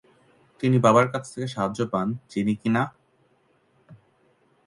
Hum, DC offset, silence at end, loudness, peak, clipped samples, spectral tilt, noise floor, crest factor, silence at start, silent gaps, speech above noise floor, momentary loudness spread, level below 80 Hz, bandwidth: none; under 0.1%; 0.7 s; -24 LUFS; -4 dBFS; under 0.1%; -7 dB/octave; -64 dBFS; 22 dB; 0.6 s; none; 42 dB; 12 LU; -62 dBFS; 11.5 kHz